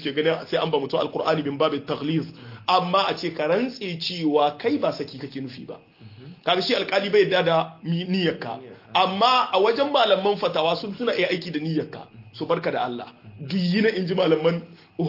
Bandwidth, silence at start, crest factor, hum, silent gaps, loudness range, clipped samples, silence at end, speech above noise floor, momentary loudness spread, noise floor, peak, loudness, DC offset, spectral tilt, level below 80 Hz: 5.8 kHz; 0 s; 18 dB; none; none; 4 LU; under 0.1%; 0 s; 21 dB; 15 LU; -44 dBFS; -4 dBFS; -23 LUFS; under 0.1%; -6.5 dB/octave; -68 dBFS